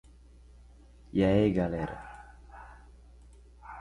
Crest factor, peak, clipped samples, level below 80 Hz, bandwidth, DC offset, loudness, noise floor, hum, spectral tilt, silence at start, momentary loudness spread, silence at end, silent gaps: 20 dB; -12 dBFS; under 0.1%; -50 dBFS; 11 kHz; under 0.1%; -28 LUFS; -54 dBFS; 60 Hz at -50 dBFS; -8.5 dB/octave; 1.15 s; 26 LU; 0 s; none